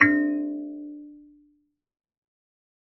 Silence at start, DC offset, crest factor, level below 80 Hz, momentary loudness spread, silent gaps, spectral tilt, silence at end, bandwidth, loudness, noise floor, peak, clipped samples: 0 s; under 0.1%; 26 dB; -72 dBFS; 22 LU; none; -4.5 dB/octave; 1.65 s; 6 kHz; -26 LUFS; -68 dBFS; -2 dBFS; under 0.1%